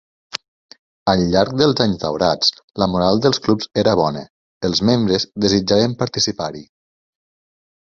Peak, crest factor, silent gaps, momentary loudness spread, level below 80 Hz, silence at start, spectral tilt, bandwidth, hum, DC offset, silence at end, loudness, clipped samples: 0 dBFS; 18 dB; 0.48-0.69 s, 0.79-1.06 s, 2.64-2.68 s, 4.30-4.61 s; 12 LU; -46 dBFS; 0.35 s; -5 dB/octave; 7.6 kHz; none; under 0.1%; 1.3 s; -17 LUFS; under 0.1%